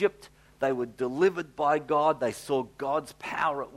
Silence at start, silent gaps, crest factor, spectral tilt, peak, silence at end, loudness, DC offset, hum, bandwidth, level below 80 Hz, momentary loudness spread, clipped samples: 0 s; none; 16 dB; -5.5 dB/octave; -12 dBFS; 0 s; -28 LUFS; under 0.1%; none; 15 kHz; -64 dBFS; 7 LU; under 0.1%